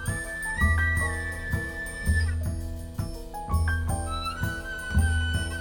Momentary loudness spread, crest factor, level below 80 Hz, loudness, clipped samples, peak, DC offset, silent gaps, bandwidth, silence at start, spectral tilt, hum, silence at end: 11 LU; 16 dB; -32 dBFS; -28 LUFS; under 0.1%; -12 dBFS; under 0.1%; none; 18.5 kHz; 0 s; -5 dB/octave; none; 0 s